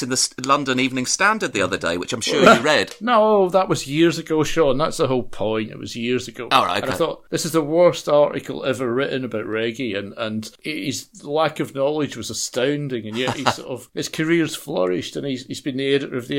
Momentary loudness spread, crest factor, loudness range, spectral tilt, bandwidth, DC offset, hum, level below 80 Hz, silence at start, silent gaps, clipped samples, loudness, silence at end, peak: 11 LU; 20 dB; 7 LU; -4 dB/octave; 16.5 kHz; under 0.1%; none; -48 dBFS; 0 s; none; under 0.1%; -20 LUFS; 0 s; 0 dBFS